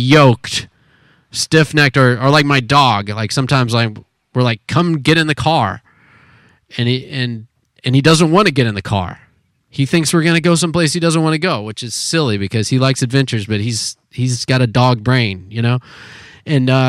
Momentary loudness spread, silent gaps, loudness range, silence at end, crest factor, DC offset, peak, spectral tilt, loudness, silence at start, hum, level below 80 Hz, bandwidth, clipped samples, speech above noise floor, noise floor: 10 LU; none; 4 LU; 0 s; 14 dB; under 0.1%; 0 dBFS; -5 dB/octave; -14 LUFS; 0 s; none; -48 dBFS; 14 kHz; under 0.1%; 40 dB; -54 dBFS